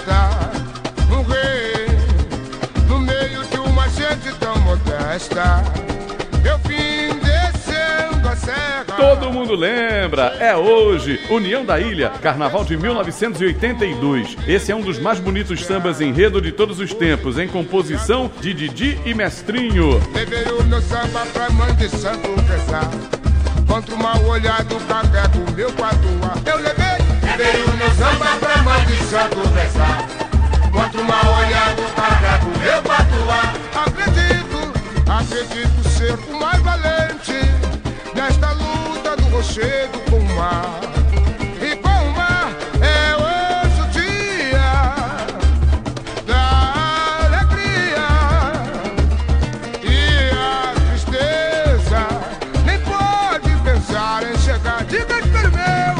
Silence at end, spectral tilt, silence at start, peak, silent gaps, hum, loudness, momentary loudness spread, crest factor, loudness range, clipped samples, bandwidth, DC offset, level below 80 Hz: 0 s; -5.5 dB/octave; 0 s; 0 dBFS; none; none; -17 LUFS; 7 LU; 16 dB; 3 LU; under 0.1%; 10 kHz; under 0.1%; -20 dBFS